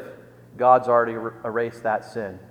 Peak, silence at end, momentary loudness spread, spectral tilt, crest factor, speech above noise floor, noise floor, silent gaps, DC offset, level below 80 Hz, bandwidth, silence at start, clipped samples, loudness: -2 dBFS; 0.05 s; 15 LU; -7 dB/octave; 20 dB; 23 dB; -45 dBFS; none; under 0.1%; -66 dBFS; 10 kHz; 0 s; under 0.1%; -22 LUFS